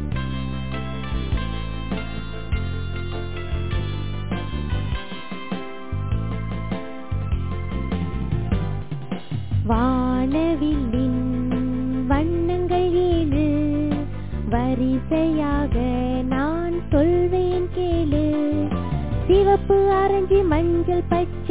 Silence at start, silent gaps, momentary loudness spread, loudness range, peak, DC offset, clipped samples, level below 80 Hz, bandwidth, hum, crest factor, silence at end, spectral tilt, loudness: 0 s; none; 11 LU; 9 LU; -6 dBFS; 2%; under 0.1%; -30 dBFS; 4 kHz; none; 16 dB; 0 s; -12 dB/octave; -23 LUFS